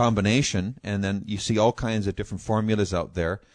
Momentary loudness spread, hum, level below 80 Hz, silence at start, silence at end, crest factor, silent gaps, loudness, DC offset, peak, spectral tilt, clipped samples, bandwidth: 7 LU; none; -44 dBFS; 0 s; 0.15 s; 16 dB; none; -25 LUFS; under 0.1%; -8 dBFS; -5.5 dB/octave; under 0.1%; 10.5 kHz